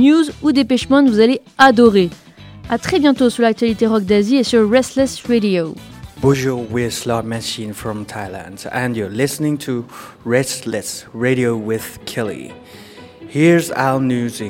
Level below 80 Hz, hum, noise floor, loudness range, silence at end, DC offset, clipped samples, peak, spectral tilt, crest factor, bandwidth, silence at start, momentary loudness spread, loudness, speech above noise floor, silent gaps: -48 dBFS; none; -37 dBFS; 8 LU; 0 s; under 0.1%; under 0.1%; 0 dBFS; -5.5 dB/octave; 16 dB; 17 kHz; 0 s; 14 LU; -16 LUFS; 21 dB; none